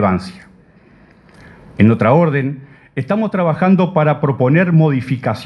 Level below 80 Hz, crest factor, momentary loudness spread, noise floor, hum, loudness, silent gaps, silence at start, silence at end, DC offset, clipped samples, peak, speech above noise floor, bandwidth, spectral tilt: -50 dBFS; 16 dB; 14 LU; -47 dBFS; none; -14 LUFS; none; 0 s; 0 s; under 0.1%; under 0.1%; 0 dBFS; 33 dB; 9.4 kHz; -9.5 dB/octave